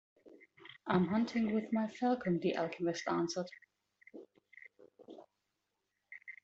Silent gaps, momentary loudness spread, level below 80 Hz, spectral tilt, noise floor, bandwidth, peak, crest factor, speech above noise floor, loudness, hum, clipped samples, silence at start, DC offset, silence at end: none; 23 LU; -74 dBFS; -5.5 dB/octave; -86 dBFS; 8 kHz; -16 dBFS; 22 dB; 51 dB; -35 LUFS; none; under 0.1%; 0.25 s; under 0.1%; 0.1 s